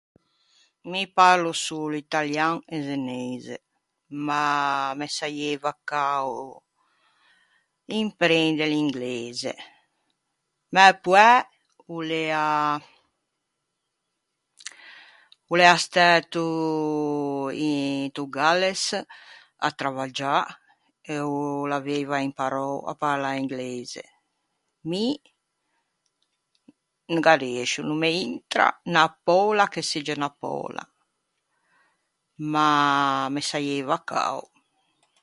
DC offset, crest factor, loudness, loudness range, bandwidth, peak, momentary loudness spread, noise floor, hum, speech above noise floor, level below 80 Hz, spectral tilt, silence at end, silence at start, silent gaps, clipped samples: under 0.1%; 24 dB; -23 LUFS; 9 LU; 11.5 kHz; 0 dBFS; 16 LU; -79 dBFS; none; 56 dB; -74 dBFS; -4 dB/octave; 0.8 s; 0.85 s; none; under 0.1%